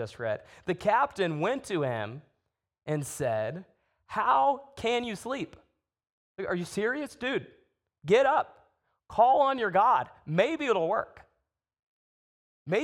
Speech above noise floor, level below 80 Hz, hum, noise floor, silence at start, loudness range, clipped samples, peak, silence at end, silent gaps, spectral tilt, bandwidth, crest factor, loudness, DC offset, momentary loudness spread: 52 dB; -66 dBFS; none; -80 dBFS; 0 s; 6 LU; under 0.1%; -10 dBFS; 0 s; 6.12-6.35 s, 11.79-12.66 s; -5 dB/octave; 16.5 kHz; 20 dB; -28 LUFS; under 0.1%; 15 LU